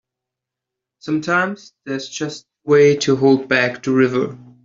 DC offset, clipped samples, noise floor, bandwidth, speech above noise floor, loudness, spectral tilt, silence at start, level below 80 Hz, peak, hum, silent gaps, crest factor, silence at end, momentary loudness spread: under 0.1%; under 0.1%; -84 dBFS; 7.6 kHz; 67 dB; -17 LUFS; -5.5 dB/octave; 1.05 s; -62 dBFS; -2 dBFS; none; none; 16 dB; 0.25 s; 15 LU